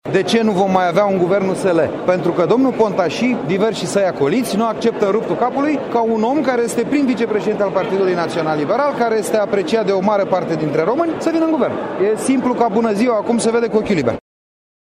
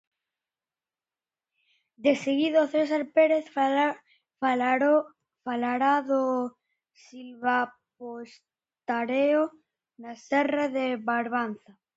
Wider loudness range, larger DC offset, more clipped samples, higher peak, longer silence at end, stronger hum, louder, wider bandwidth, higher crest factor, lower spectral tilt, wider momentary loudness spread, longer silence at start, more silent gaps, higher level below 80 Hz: second, 1 LU vs 5 LU; neither; neither; first, -2 dBFS vs -10 dBFS; first, 0.75 s vs 0.4 s; neither; first, -17 LUFS vs -26 LUFS; first, 15.5 kHz vs 8 kHz; about the same, 14 dB vs 18 dB; about the same, -5.5 dB/octave vs -5 dB/octave; second, 3 LU vs 20 LU; second, 0.05 s vs 2 s; neither; first, -54 dBFS vs -78 dBFS